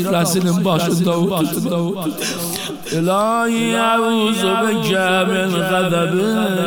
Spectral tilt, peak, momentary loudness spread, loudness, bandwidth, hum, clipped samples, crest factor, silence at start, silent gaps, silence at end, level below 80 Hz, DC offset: -5 dB/octave; -4 dBFS; 6 LU; -17 LUFS; 19 kHz; none; under 0.1%; 14 dB; 0 s; none; 0 s; -58 dBFS; 0.4%